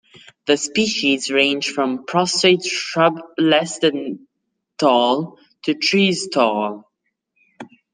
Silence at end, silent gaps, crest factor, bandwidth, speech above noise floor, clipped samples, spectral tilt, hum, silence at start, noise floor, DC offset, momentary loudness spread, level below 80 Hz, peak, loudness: 0.25 s; none; 18 dB; 10 kHz; 58 dB; under 0.1%; -3.5 dB/octave; none; 0.45 s; -76 dBFS; under 0.1%; 12 LU; -68 dBFS; -2 dBFS; -18 LUFS